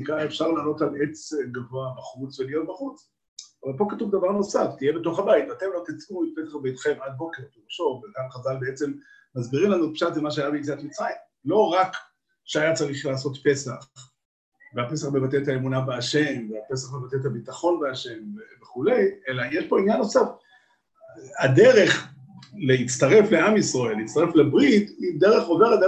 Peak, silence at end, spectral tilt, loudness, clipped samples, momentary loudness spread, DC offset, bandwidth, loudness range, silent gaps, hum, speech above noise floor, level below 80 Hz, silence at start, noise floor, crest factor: -4 dBFS; 0 s; -5.5 dB/octave; -23 LUFS; under 0.1%; 17 LU; under 0.1%; 9 kHz; 9 LU; 3.28-3.37 s, 14.25-14.52 s; none; 38 dB; -64 dBFS; 0 s; -61 dBFS; 18 dB